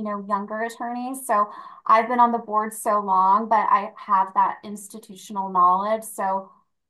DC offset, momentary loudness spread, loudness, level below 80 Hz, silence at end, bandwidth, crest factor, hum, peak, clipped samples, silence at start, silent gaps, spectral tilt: under 0.1%; 13 LU; -22 LUFS; -78 dBFS; 0.45 s; 12.5 kHz; 16 dB; none; -6 dBFS; under 0.1%; 0 s; none; -4.5 dB/octave